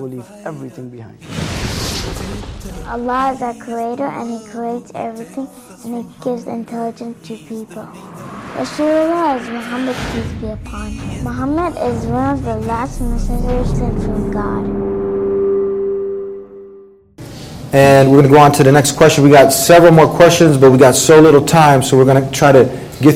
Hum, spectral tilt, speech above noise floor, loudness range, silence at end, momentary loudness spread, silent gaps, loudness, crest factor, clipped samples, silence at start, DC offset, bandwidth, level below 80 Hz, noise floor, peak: none; -5.5 dB/octave; 28 dB; 17 LU; 0 s; 22 LU; none; -12 LUFS; 14 dB; 0.2%; 0 s; under 0.1%; 16.5 kHz; -30 dBFS; -40 dBFS; 0 dBFS